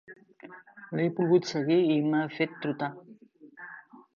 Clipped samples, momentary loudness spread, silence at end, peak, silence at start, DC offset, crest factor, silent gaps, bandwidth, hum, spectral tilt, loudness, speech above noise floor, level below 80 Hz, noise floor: under 0.1%; 24 LU; 0.35 s; -12 dBFS; 0.1 s; under 0.1%; 18 dB; none; 7.2 kHz; none; -7 dB/octave; -28 LUFS; 27 dB; -78 dBFS; -53 dBFS